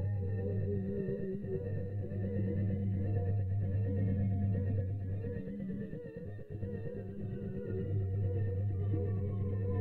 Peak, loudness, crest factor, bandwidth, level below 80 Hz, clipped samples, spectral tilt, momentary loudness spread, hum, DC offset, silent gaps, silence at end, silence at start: -24 dBFS; -37 LUFS; 12 dB; 2.9 kHz; -54 dBFS; under 0.1%; -12 dB/octave; 8 LU; none; under 0.1%; none; 0 s; 0 s